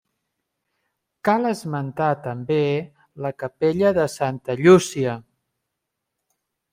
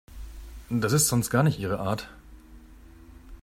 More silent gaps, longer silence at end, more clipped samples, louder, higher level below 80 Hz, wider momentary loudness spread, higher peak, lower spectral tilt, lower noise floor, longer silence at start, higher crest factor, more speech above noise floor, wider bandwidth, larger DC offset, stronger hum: neither; first, 1.5 s vs 0.05 s; neither; first, -21 LUFS vs -25 LUFS; second, -60 dBFS vs -46 dBFS; second, 14 LU vs 23 LU; first, -2 dBFS vs -8 dBFS; first, -6 dB/octave vs -4.5 dB/octave; first, -81 dBFS vs -49 dBFS; first, 1.25 s vs 0.1 s; about the same, 20 dB vs 20 dB; first, 60 dB vs 24 dB; about the same, 15.5 kHz vs 16 kHz; neither; neither